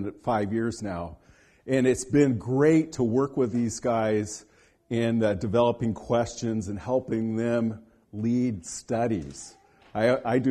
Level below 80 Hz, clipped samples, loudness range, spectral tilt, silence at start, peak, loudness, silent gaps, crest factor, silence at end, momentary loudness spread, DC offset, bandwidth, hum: -54 dBFS; under 0.1%; 4 LU; -6.5 dB/octave; 0 s; -8 dBFS; -26 LUFS; none; 18 dB; 0 s; 13 LU; under 0.1%; 12 kHz; none